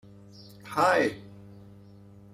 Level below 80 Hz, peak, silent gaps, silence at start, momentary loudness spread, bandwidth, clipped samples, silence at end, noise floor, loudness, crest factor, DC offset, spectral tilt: -68 dBFS; -8 dBFS; none; 0.4 s; 26 LU; 15.5 kHz; under 0.1%; 0.85 s; -51 dBFS; -26 LUFS; 22 dB; under 0.1%; -4.5 dB/octave